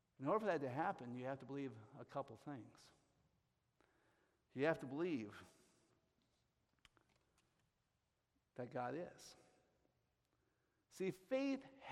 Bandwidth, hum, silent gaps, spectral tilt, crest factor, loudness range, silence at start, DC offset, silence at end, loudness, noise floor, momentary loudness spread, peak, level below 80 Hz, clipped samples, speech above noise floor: 13.5 kHz; none; none; -6.5 dB/octave; 24 dB; 7 LU; 0.2 s; under 0.1%; 0 s; -46 LUFS; -87 dBFS; 18 LU; -24 dBFS; -86 dBFS; under 0.1%; 42 dB